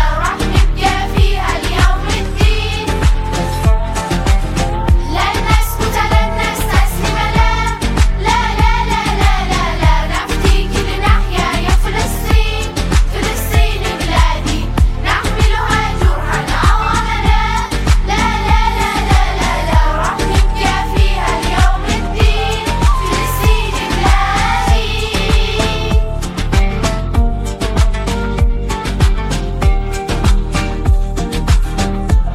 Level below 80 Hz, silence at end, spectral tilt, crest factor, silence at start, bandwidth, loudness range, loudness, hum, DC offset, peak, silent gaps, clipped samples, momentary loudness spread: -14 dBFS; 0 s; -5 dB/octave; 12 dB; 0 s; 15.5 kHz; 2 LU; -15 LUFS; none; under 0.1%; 0 dBFS; none; under 0.1%; 4 LU